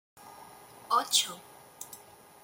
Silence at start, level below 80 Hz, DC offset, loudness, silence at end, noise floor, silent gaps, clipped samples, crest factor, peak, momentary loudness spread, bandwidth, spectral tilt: 0.2 s; -80 dBFS; under 0.1%; -28 LUFS; 0.45 s; -52 dBFS; none; under 0.1%; 24 dB; -10 dBFS; 26 LU; 17 kHz; 1 dB/octave